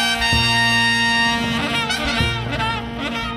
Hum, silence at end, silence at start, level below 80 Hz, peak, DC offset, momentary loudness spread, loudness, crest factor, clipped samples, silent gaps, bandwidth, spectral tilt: none; 0 s; 0 s; -34 dBFS; -4 dBFS; under 0.1%; 8 LU; -17 LUFS; 14 dB; under 0.1%; none; 16 kHz; -3.5 dB/octave